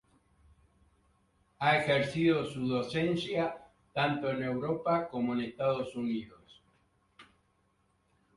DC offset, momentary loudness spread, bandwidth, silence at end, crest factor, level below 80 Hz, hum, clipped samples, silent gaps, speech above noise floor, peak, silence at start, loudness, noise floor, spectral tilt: under 0.1%; 8 LU; 11.5 kHz; 1.15 s; 20 dB; -66 dBFS; none; under 0.1%; none; 42 dB; -14 dBFS; 1.6 s; -32 LUFS; -73 dBFS; -6.5 dB/octave